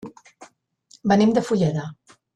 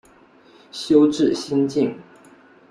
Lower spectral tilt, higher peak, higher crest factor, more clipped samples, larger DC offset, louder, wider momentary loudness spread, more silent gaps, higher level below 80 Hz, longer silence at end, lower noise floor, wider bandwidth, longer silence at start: about the same, -7 dB/octave vs -6 dB/octave; about the same, -6 dBFS vs -4 dBFS; about the same, 18 dB vs 18 dB; neither; neither; about the same, -21 LUFS vs -19 LUFS; about the same, 19 LU vs 19 LU; neither; about the same, -58 dBFS vs -62 dBFS; second, 0.45 s vs 0.7 s; first, -56 dBFS vs -51 dBFS; second, 9.6 kHz vs 11 kHz; second, 0.05 s vs 0.75 s